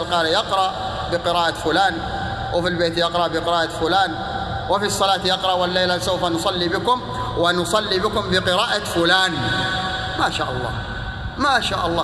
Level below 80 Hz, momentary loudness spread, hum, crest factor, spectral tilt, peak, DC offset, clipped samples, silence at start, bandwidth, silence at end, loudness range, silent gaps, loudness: -40 dBFS; 8 LU; none; 18 dB; -4 dB/octave; -2 dBFS; under 0.1%; under 0.1%; 0 s; 14 kHz; 0 s; 2 LU; none; -20 LUFS